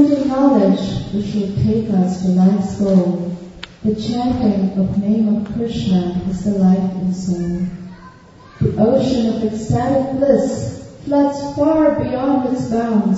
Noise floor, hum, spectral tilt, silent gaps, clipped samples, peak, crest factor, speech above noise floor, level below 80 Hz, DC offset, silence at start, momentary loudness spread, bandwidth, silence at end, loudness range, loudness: -42 dBFS; none; -8 dB/octave; none; under 0.1%; -2 dBFS; 16 dB; 26 dB; -40 dBFS; under 0.1%; 0 s; 8 LU; 8 kHz; 0 s; 2 LU; -17 LUFS